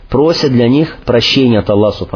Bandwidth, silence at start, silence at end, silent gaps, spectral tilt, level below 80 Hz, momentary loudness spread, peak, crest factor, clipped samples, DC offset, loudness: 5.4 kHz; 0 s; 0 s; none; -6.5 dB/octave; -34 dBFS; 4 LU; 0 dBFS; 10 dB; under 0.1%; under 0.1%; -11 LUFS